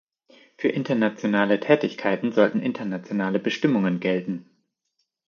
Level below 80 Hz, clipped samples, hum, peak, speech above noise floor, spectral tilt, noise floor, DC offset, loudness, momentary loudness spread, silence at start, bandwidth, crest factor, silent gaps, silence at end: -72 dBFS; under 0.1%; none; -2 dBFS; 53 dB; -7 dB/octave; -76 dBFS; under 0.1%; -23 LUFS; 7 LU; 0.6 s; 7 kHz; 22 dB; none; 0.85 s